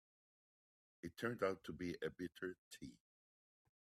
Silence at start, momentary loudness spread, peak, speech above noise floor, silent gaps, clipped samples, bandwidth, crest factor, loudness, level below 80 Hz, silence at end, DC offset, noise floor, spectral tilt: 1.05 s; 15 LU; -26 dBFS; over 44 dB; 2.58-2.71 s; under 0.1%; 15.5 kHz; 22 dB; -47 LUFS; -78 dBFS; 0.9 s; under 0.1%; under -90 dBFS; -5.5 dB/octave